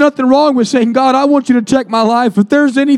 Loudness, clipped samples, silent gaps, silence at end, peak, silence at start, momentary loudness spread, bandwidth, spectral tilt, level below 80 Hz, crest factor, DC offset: -11 LUFS; under 0.1%; none; 0 s; 0 dBFS; 0 s; 2 LU; 11 kHz; -5.5 dB/octave; -54 dBFS; 10 dB; under 0.1%